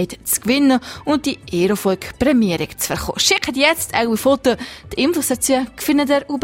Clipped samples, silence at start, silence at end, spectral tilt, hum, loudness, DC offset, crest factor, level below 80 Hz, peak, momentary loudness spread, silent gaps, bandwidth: under 0.1%; 0 s; 0 s; -3.5 dB/octave; none; -17 LUFS; under 0.1%; 18 dB; -44 dBFS; 0 dBFS; 6 LU; none; 16.5 kHz